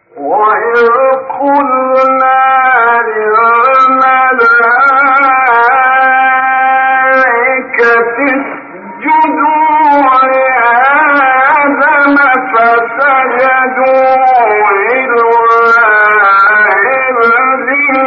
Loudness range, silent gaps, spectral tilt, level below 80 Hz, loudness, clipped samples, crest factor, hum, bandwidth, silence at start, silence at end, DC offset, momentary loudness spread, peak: 2 LU; none; -5.5 dB/octave; -58 dBFS; -7 LUFS; under 0.1%; 8 dB; none; 6.8 kHz; 0.15 s; 0 s; under 0.1%; 4 LU; 0 dBFS